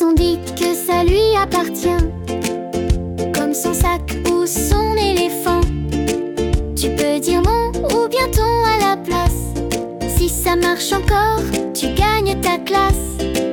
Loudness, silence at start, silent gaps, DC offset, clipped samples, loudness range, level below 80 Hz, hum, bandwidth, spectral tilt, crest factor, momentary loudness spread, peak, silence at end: -17 LUFS; 0 s; none; under 0.1%; under 0.1%; 1 LU; -24 dBFS; none; 19 kHz; -4.5 dB/octave; 12 dB; 6 LU; -4 dBFS; 0 s